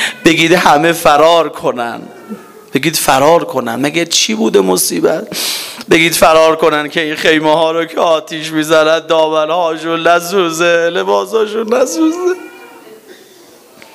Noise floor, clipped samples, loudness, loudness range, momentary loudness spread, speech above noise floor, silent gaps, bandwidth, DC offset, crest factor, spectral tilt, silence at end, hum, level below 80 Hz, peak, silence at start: -40 dBFS; 0.4%; -11 LUFS; 3 LU; 9 LU; 29 dB; none; 16.5 kHz; under 0.1%; 12 dB; -3 dB/octave; 0.8 s; none; -48 dBFS; 0 dBFS; 0 s